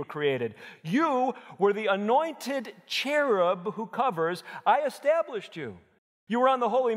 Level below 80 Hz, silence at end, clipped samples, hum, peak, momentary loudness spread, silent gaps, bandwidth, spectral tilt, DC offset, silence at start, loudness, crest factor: -82 dBFS; 0 s; under 0.1%; none; -10 dBFS; 10 LU; 5.98-6.27 s; 16 kHz; -5 dB/octave; under 0.1%; 0 s; -27 LUFS; 18 dB